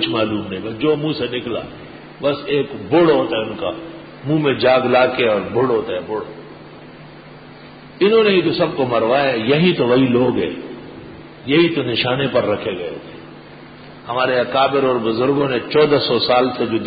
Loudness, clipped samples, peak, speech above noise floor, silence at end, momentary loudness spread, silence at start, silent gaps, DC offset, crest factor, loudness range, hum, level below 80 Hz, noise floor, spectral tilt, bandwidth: -17 LUFS; under 0.1%; -2 dBFS; 22 dB; 0 s; 20 LU; 0 s; none; under 0.1%; 16 dB; 4 LU; none; -52 dBFS; -39 dBFS; -11 dB/octave; 5 kHz